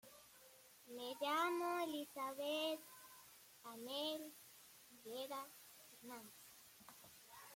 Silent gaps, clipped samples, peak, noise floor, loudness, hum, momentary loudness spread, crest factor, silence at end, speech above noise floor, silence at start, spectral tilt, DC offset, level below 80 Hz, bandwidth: none; under 0.1%; -30 dBFS; -66 dBFS; -45 LUFS; none; 20 LU; 18 dB; 0 s; 18 dB; 0.05 s; -2 dB/octave; under 0.1%; under -90 dBFS; 16.5 kHz